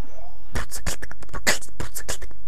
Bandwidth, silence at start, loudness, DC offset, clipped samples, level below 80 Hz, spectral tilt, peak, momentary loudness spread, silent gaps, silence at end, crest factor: 16.5 kHz; 0 s; -29 LUFS; 20%; under 0.1%; -38 dBFS; -2 dB/octave; 0 dBFS; 14 LU; none; 0 s; 30 dB